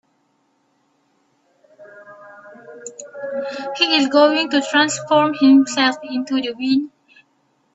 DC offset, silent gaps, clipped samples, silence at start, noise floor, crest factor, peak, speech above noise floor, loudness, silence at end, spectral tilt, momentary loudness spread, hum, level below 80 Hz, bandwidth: under 0.1%; none; under 0.1%; 1.8 s; -64 dBFS; 18 dB; -2 dBFS; 48 dB; -17 LUFS; 0.85 s; -3 dB/octave; 20 LU; none; -68 dBFS; 8.2 kHz